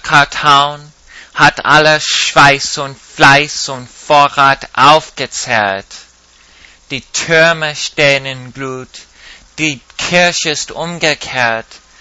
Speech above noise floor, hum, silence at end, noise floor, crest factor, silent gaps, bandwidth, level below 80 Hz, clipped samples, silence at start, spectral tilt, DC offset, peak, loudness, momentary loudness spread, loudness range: 33 dB; none; 0.25 s; -45 dBFS; 12 dB; none; 11 kHz; -44 dBFS; 0.8%; 0.05 s; -2.5 dB/octave; under 0.1%; 0 dBFS; -11 LUFS; 16 LU; 6 LU